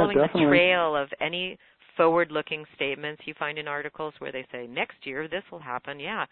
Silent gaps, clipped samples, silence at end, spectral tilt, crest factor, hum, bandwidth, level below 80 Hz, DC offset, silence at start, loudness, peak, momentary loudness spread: none; under 0.1%; 0.05 s; -9.5 dB/octave; 22 dB; none; 4.4 kHz; -62 dBFS; under 0.1%; 0 s; -27 LUFS; -6 dBFS; 15 LU